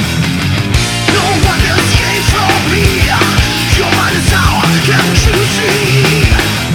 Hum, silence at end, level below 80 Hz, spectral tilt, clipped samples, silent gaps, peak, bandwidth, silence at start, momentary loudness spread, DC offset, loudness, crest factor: none; 0 s; -20 dBFS; -4 dB/octave; under 0.1%; none; 0 dBFS; 19 kHz; 0 s; 3 LU; under 0.1%; -10 LUFS; 10 dB